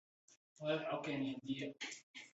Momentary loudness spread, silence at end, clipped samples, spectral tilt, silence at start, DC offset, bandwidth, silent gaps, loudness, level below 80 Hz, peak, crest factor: 8 LU; 0.05 s; under 0.1%; -4 dB/octave; 0.3 s; under 0.1%; 8 kHz; 0.37-0.56 s, 2.03-2.14 s; -43 LUFS; -84 dBFS; -26 dBFS; 18 dB